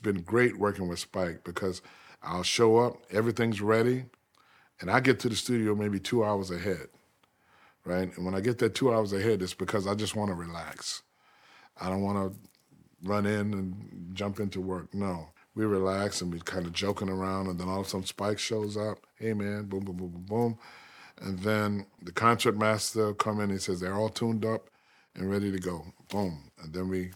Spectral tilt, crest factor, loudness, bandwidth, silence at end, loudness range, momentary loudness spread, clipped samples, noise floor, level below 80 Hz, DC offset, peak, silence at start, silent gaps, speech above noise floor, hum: -5 dB/octave; 24 dB; -30 LUFS; 17.5 kHz; 0 s; 6 LU; 13 LU; under 0.1%; -68 dBFS; -64 dBFS; under 0.1%; -6 dBFS; 0 s; none; 38 dB; none